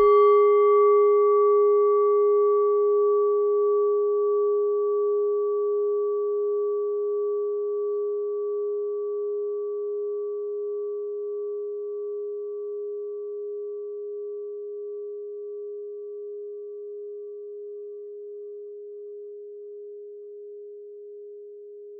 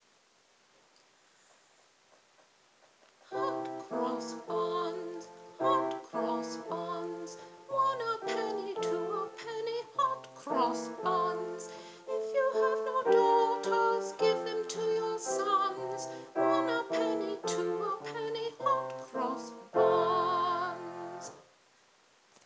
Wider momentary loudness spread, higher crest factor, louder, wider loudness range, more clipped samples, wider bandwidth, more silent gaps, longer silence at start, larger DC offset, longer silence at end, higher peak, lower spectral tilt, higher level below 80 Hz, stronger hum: first, 21 LU vs 13 LU; about the same, 14 dB vs 18 dB; first, -24 LUFS vs -32 LUFS; first, 19 LU vs 8 LU; neither; second, 3.4 kHz vs 8 kHz; neither; second, 0 s vs 3.3 s; neither; second, 0 s vs 1.05 s; first, -10 dBFS vs -16 dBFS; about the same, -3 dB/octave vs -4 dB/octave; first, -72 dBFS vs under -90 dBFS; neither